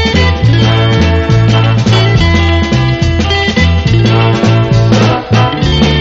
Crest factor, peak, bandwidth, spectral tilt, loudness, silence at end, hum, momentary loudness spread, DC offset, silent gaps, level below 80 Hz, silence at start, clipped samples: 8 dB; 0 dBFS; 7.8 kHz; -6.5 dB/octave; -9 LUFS; 0 s; none; 2 LU; under 0.1%; none; -20 dBFS; 0 s; 0.2%